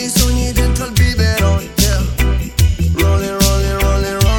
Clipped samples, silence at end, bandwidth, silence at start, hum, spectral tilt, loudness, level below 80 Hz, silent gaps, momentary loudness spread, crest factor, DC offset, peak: under 0.1%; 0 s; 18 kHz; 0 s; none; -4.5 dB/octave; -15 LUFS; -16 dBFS; none; 3 LU; 12 dB; under 0.1%; 0 dBFS